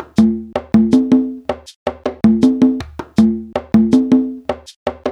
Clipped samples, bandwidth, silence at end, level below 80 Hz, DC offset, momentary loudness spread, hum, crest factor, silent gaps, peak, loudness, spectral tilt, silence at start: under 0.1%; 9.8 kHz; 0 s; -42 dBFS; under 0.1%; 13 LU; none; 14 dB; 1.76-1.86 s, 4.76-4.86 s; 0 dBFS; -15 LUFS; -7.5 dB/octave; 0 s